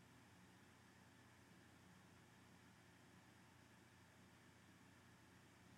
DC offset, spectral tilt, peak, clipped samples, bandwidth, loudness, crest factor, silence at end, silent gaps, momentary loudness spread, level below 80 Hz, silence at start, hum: under 0.1%; -4.5 dB/octave; -54 dBFS; under 0.1%; 14.5 kHz; -68 LUFS; 14 dB; 0 s; none; 1 LU; -88 dBFS; 0 s; none